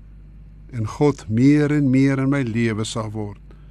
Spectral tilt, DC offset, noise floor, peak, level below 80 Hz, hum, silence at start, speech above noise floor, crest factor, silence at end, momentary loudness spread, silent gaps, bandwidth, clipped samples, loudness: -7 dB/octave; under 0.1%; -42 dBFS; -6 dBFS; -44 dBFS; 50 Hz at -40 dBFS; 0 s; 23 dB; 14 dB; 0.05 s; 14 LU; none; 11 kHz; under 0.1%; -19 LUFS